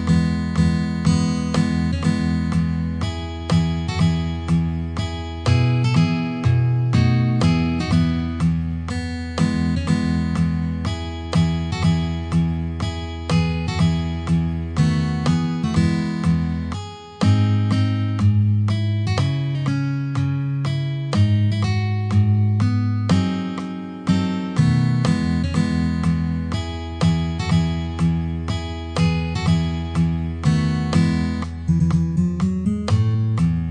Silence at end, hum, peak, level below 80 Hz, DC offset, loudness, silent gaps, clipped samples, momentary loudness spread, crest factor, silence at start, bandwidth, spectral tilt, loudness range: 0 s; none; -6 dBFS; -34 dBFS; under 0.1%; -21 LUFS; none; under 0.1%; 7 LU; 14 dB; 0 s; 10 kHz; -7 dB/octave; 2 LU